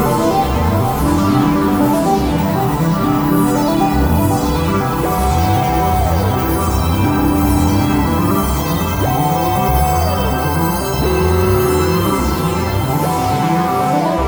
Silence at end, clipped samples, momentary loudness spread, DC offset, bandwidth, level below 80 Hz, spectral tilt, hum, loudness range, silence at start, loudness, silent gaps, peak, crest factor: 0 s; under 0.1%; 3 LU; under 0.1%; over 20 kHz; -24 dBFS; -6 dB/octave; none; 1 LU; 0 s; -15 LUFS; none; 0 dBFS; 14 dB